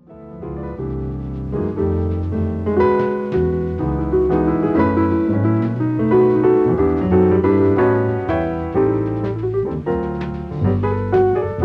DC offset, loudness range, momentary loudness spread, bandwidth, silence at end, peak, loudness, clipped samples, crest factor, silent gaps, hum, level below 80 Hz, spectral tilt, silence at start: under 0.1%; 5 LU; 11 LU; 5.2 kHz; 0 s; -4 dBFS; -18 LUFS; under 0.1%; 14 dB; none; none; -34 dBFS; -11 dB/octave; 0.1 s